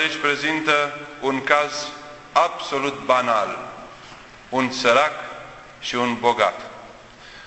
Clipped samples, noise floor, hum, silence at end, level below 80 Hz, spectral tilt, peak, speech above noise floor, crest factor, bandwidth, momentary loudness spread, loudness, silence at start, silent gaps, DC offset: under 0.1%; -43 dBFS; none; 0 s; -58 dBFS; -3 dB/octave; 0 dBFS; 22 dB; 22 dB; 8.4 kHz; 21 LU; -21 LUFS; 0 s; none; under 0.1%